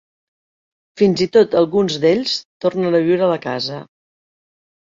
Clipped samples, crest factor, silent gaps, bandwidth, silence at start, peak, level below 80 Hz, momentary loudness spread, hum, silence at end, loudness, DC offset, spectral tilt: under 0.1%; 16 dB; 2.45-2.60 s; 7.8 kHz; 0.95 s; -2 dBFS; -58 dBFS; 9 LU; none; 1.05 s; -17 LUFS; under 0.1%; -6 dB/octave